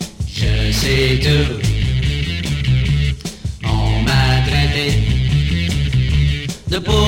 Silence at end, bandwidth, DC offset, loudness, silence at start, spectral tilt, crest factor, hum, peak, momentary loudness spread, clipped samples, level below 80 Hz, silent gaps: 0 s; 16.5 kHz; under 0.1%; -17 LUFS; 0 s; -5.5 dB/octave; 14 dB; none; -2 dBFS; 7 LU; under 0.1%; -22 dBFS; none